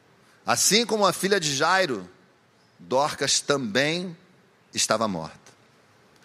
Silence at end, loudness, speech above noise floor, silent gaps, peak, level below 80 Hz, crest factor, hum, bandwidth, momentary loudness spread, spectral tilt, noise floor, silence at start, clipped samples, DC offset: 0.75 s; -23 LUFS; 36 dB; none; -4 dBFS; -70 dBFS; 22 dB; none; 15.5 kHz; 15 LU; -2.5 dB/octave; -60 dBFS; 0.45 s; under 0.1%; under 0.1%